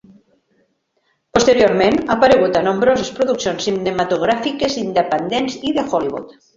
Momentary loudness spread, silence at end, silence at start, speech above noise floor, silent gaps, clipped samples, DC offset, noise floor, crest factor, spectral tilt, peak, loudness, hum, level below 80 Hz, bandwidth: 8 LU; 0.25 s; 1.35 s; 50 dB; none; under 0.1%; under 0.1%; -66 dBFS; 16 dB; -4.5 dB/octave; 0 dBFS; -16 LUFS; none; -48 dBFS; 7.8 kHz